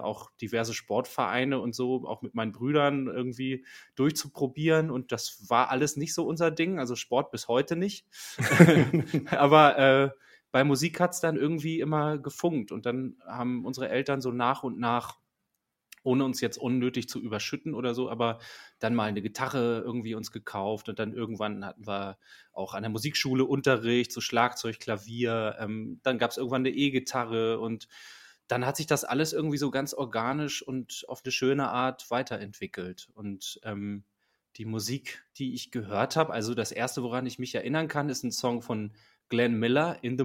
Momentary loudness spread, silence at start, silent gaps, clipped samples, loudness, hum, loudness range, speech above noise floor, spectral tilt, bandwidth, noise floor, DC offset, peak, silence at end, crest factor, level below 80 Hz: 12 LU; 0 s; none; under 0.1%; -29 LUFS; none; 9 LU; 54 dB; -5 dB/octave; 16.5 kHz; -82 dBFS; under 0.1%; 0 dBFS; 0 s; 28 dB; -68 dBFS